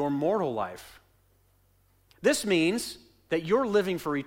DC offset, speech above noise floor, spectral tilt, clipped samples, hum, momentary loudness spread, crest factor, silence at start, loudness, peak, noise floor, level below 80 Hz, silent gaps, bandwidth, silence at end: under 0.1%; 38 dB; -4.5 dB/octave; under 0.1%; none; 13 LU; 16 dB; 0 s; -28 LUFS; -12 dBFS; -65 dBFS; -62 dBFS; none; 16.5 kHz; 0 s